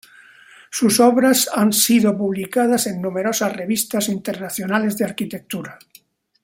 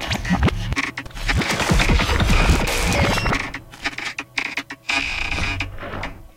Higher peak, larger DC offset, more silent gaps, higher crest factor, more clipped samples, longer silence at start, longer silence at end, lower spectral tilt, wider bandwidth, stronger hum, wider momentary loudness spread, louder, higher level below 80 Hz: about the same, -2 dBFS vs -4 dBFS; neither; neither; about the same, 18 dB vs 18 dB; neither; first, 0.7 s vs 0 s; first, 0.7 s vs 0.1 s; about the same, -3.5 dB/octave vs -4 dB/octave; about the same, 16.5 kHz vs 16.5 kHz; neither; first, 14 LU vs 10 LU; first, -18 LUFS vs -21 LUFS; second, -62 dBFS vs -26 dBFS